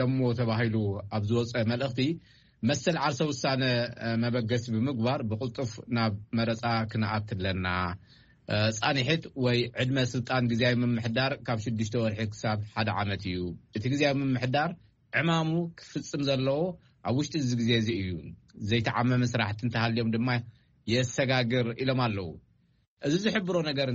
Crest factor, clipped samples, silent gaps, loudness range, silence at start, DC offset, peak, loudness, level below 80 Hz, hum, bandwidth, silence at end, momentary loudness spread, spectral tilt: 20 dB; under 0.1%; 22.88-22.97 s; 2 LU; 0 s; under 0.1%; -10 dBFS; -29 LUFS; -58 dBFS; none; 7.6 kHz; 0 s; 8 LU; -5 dB/octave